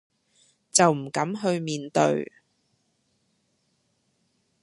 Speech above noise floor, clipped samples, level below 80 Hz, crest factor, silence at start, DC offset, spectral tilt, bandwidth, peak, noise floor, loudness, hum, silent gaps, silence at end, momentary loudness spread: 48 dB; under 0.1%; -74 dBFS; 24 dB; 0.75 s; under 0.1%; -4 dB/octave; 11.5 kHz; -4 dBFS; -72 dBFS; -24 LUFS; none; none; 2.4 s; 9 LU